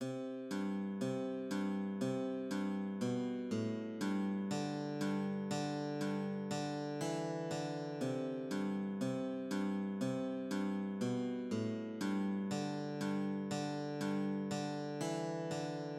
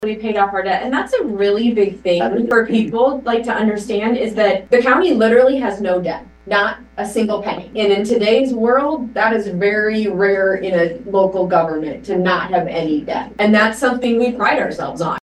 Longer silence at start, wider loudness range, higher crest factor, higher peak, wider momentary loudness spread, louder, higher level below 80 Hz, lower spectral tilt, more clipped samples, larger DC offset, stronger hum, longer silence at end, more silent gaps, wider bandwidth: about the same, 0 s vs 0 s; about the same, 1 LU vs 2 LU; about the same, 14 dB vs 16 dB; second, -24 dBFS vs 0 dBFS; second, 3 LU vs 7 LU; second, -39 LUFS vs -16 LUFS; second, under -90 dBFS vs -48 dBFS; about the same, -6 dB/octave vs -5.5 dB/octave; neither; neither; neither; about the same, 0 s vs 0.1 s; neither; about the same, 13 kHz vs 12.5 kHz